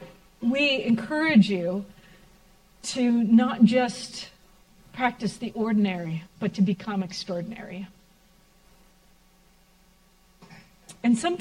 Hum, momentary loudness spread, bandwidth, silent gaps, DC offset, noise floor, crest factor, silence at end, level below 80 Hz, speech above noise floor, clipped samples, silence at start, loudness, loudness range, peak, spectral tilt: none; 18 LU; 11.5 kHz; none; under 0.1%; -59 dBFS; 20 dB; 0.05 s; -60 dBFS; 35 dB; under 0.1%; 0 s; -25 LUFS; 13 LU; -8 dBFS; -5.5 dB/octave